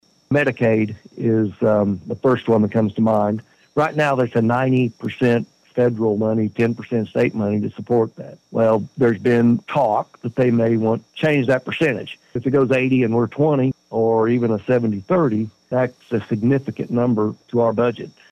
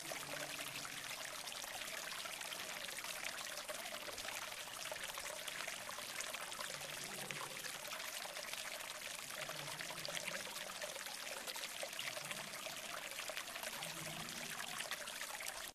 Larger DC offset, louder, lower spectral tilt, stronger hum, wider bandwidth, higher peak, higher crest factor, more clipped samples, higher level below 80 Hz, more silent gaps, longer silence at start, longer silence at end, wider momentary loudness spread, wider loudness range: neither; first, -19 LUFS vs -45 LUFS; first, -8.5 dB/octave vs -0.5 dB/octave; neither; second, 9 kHz vs 15.5 kHz; first, -6 dBFS vs -22 dBFS; second, 14 dB vs 24 dB; neither; first, -60 dBFS vs -76 dBFS; neither; first, 0.3 s vs 0 s; first, 0.25 s vs 0 s; first, 7 LU vs 2 LU; about the same, 2 LU vs 0 LU